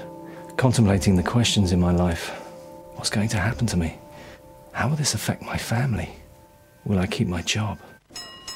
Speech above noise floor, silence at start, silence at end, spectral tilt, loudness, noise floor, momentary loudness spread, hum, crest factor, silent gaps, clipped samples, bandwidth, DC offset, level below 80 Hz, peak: 29 dB; 0 s; 0 s; -5 dB/octave; -23 LUFS; -52 dBFS; 20 LU; none; 20 dB; none; under 0.1%; 16.5 kHz; under 0.1%; -42 dBFS; -4 dBFS